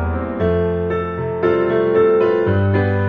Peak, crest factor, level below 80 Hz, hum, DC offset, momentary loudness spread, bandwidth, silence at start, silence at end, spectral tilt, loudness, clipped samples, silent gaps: -4 dBFS; 12 dB; -36 dBFS; none; under 0.1%; 7 LU; 5 kHz; 0 s; 0 s; -7.5 dB/octave; -17 LUFS; under 0.1%; none